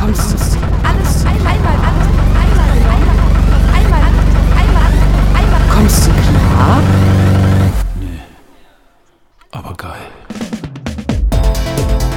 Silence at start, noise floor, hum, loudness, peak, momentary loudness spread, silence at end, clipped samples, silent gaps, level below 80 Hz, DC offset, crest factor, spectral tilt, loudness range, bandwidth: 0 s; -49 dBFS; none; -12 LUFS; 0 dBFS; 16 LU; 0 s; 0.2%; none; -12 dBFS; under 0.1%; 10 dB; -6 dB/octave; 11 LU; 16 kHz